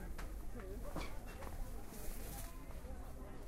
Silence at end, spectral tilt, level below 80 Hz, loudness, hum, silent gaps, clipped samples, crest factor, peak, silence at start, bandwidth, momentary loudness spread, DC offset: 0 s; -5 dB/octave; -48 dBFS; -50 LUFS; none; none; under 0.1%; 14 dB; -32 dBFS; 0 s; 16 kHz; 4 LU; under 0.1%